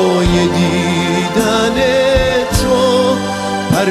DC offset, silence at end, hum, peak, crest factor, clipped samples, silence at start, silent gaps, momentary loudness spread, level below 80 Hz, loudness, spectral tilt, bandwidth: under 0.1%; 0 s; none; -2 dBFS; 12 dB; under 0.1%; 0 s; none; 3 LU; -28 dBFS; -13 LUFS; -5 dB/octave; 15 kHz